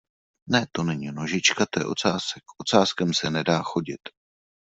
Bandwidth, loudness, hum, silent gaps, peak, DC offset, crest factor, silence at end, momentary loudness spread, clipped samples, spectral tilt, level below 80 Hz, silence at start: 8.2 kHz; -24 LUFS; none; none; -4 dBFS; under 0.1%; 22 dB; 0.55 s; 11 LU; under 0.1%; -4 dB/octave; -62 dBFS; 0.45 s